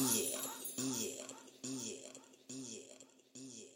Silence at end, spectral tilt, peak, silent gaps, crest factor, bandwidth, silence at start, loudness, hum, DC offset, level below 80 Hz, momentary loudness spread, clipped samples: 0 s; -2.5 dB/octave; -20 dBFS; none; 24 dB; 16.5 kHz; 0 s; -42 LUFS; none; under 0.1%; -84 dBFS; 19 LU; under 0.1%